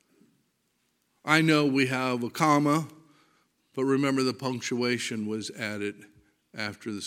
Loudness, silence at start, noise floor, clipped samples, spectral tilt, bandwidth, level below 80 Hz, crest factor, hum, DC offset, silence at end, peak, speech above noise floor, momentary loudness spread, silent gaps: -27 LUFS; 1.25 s; -74 dBFS; under 0.1%; -5 dB/octave; 16 kHz; -76 dBFS; 24 dB; none; under 0.1%; 0 s; -4 dBFS; 47 dB; 13 LU; none